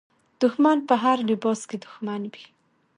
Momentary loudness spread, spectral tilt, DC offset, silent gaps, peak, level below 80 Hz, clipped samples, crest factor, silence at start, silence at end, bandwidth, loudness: 14 LU; -5.5 dB/octave; under 0.1%; none; -6 dBFS; -76 dBFS; under 0.1%; 18 dB; 0.4 s; 0.55 s; 10.5 kHz; -23 LUFS